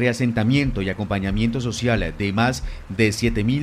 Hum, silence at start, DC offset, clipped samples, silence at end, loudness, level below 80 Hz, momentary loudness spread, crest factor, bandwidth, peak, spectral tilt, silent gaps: none; 0 s; under 0.1%; under 0.1%; 0 s; -22 LUFS; -34 dBFS; 5 LU; 16 dB; 15 kHz; -4 dBFS; -6 dB/octave; none